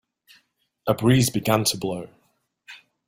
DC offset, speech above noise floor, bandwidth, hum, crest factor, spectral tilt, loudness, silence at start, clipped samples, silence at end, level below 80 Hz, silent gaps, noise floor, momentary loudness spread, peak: under 0.1%; 47 dB; 16.5 kHz; none; 20 dB; -5 dB/octave; -22 LUFS; 0.85 s; under 0.1%; 0.3 s; -56 dBFS; none; -68 dBFS; 15 LU; -6 dBFS